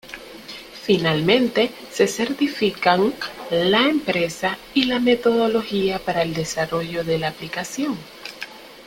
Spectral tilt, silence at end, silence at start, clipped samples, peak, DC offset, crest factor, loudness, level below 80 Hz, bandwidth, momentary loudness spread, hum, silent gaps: -4.5 dB/octave; 0 s; 0.05 s; under 0.1%; 0 dBFS; under 0.1%; 22 dB; -21 LUFS; -54 dBFS; 17 kHz; 16 LU; none; none